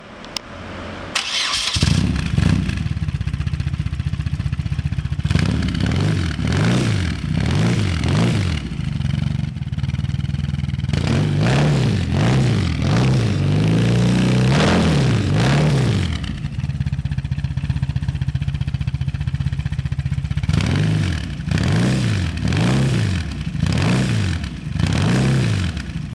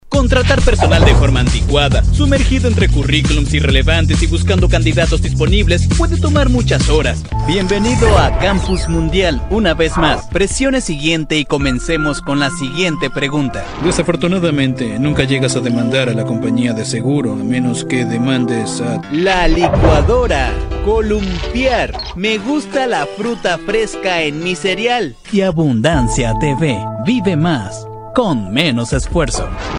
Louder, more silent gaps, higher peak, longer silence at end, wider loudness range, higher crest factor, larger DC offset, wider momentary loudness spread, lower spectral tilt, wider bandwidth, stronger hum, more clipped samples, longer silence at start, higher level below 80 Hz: second, -20 LUFS vs -14 LUFS; neither; second, -6 dBFS vs 0 dBFS; about the same, 0 s vs 0 s; about the same, 5 LU vs 3 LU; about the same, 12 dB vs 14 dB; neither; about the same, 8 LU vs 6 LU; about the same, -6 dB/octave vs -5.5 dB/octave; about the same, 12 kHz vs 11 kHz; neither; neither; about the same, 0 s vs 0.05 s; second, -32 dBFS vs -20 dBFS